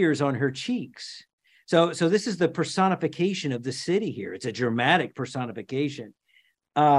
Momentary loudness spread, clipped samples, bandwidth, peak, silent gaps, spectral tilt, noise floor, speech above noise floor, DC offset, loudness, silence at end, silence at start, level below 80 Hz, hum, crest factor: 11 LU; under 0.1%; 11.5 kHz; -6 dBFS; 1.33-1.38 s; -5.5 dB/octave; -65 dBFS; 39 dB; under 0.1%; -26 LUFS; 0 s; 0 s; -70 dBFS; none; 20 dB